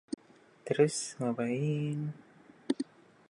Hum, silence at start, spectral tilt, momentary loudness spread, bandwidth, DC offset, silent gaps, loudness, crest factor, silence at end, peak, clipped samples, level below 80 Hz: none; 0.65 s; -5.5 dB/octave; 18 LU; 11.5 kHz; under 0.1%; none; -33 LUFS; 22 dB; 0.45 s; -12 dBFS; under 0.1%; -78 dBFS